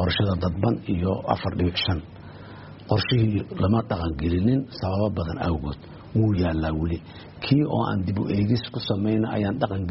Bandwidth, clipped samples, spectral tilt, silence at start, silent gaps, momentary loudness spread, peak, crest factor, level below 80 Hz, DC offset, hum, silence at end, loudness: 5.8 kHz; under 0.1%; -6 dB/octave; 0 s; none; 11 LU; -6 dBFS; 18 dB; -40 dBFS; under 0.1%; none; 0 s; -25 LUFS